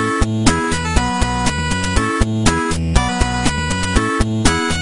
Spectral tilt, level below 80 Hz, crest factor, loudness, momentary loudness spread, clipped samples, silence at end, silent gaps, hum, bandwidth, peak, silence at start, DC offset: -4.5 dB/octave; -24 dBFS; 16 dB; -17 LUFS; 2 LU; under 0.1%; 0 s; none; none; 11 kHz; 0 dBFS; 0 s; 2%